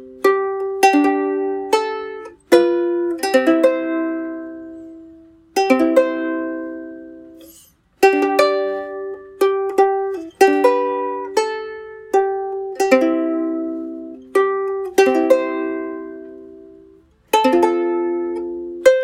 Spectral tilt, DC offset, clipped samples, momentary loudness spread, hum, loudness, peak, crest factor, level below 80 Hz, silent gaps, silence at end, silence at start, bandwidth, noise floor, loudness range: -3 dB/octave; under 0.1%; under 0.1%; 17 LU; none; -18 LUFS; 0 dBFS; 18 dB; -62 dBFS; none; 0 s; 0 s; 16.5 kHz; -50 dBFS; 3 LU